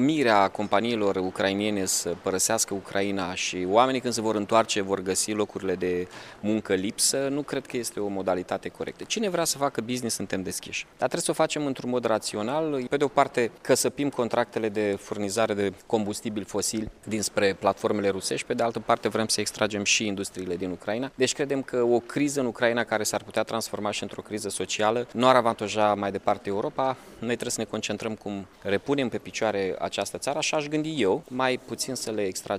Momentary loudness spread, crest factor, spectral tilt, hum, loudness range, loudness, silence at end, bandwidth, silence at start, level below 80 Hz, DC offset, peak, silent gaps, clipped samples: 8 LU; 22 dB; -3.5 dB/octave; none; 3 LU; -26 LUFS; 0 s; 15.5 kHz; 0 s; -62 dBFS; under 0.1%; -4 dBFS; none; under 0.1%